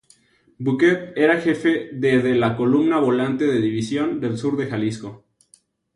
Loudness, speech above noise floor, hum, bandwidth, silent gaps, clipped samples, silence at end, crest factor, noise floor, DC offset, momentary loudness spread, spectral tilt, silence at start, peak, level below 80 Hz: -20 LUFS; 39 dB; none; 11.5 kHz; none; under 0.1%; 0.8 s; 16 dB; -58 dBFS; under 0.1%; 7 LU; -7 dB/octave; 0.6 s; -4 dBFS; -58 dBFS